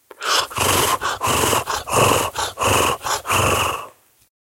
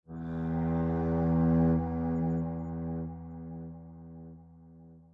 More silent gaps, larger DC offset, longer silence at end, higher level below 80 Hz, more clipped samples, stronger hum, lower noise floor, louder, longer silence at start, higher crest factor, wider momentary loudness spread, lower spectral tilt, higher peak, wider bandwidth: neither; neither; first, 0.6 s vs 0.1 s; first, -44 dBFS vs -50 dBFS; neither; neither; second, -41 dBFS vs -54 dBFS; first, -18 LUFS vs -31 LUFS; about the same, 0.2 s vs 0.1 s; about the same, 18 dB vs 14 dB; second, 5 LU vs 22 LU; second, -2.5 dB/octave vs -12 dB/octave; first, -2 dBFS vs -18 dBFS; first, 16.5 kHz vs 2.6 kHz